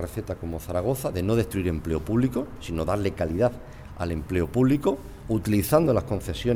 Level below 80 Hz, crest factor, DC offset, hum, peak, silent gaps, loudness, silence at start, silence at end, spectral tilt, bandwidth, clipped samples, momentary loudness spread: -40 dBFS; 20 dB; under 0.1%; none; -6 dBFS; none; -26 LUFS; 0 s; 0 s; -7 dB/octave; over 20 kHz; under 0.1%; 11 LU